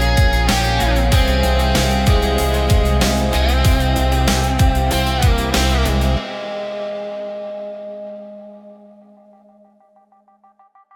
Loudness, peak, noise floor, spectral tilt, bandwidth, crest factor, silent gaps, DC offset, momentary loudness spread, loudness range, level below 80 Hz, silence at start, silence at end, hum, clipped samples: -17 LUFS; -2 dBFS; -53 dBFS; -5 dB/octave; 18 kHz; 14 dB; none; under 0.1%; 14 LU; 16 LU; -20 dBFS; 0 s; 2.2 s; none; under 0.1%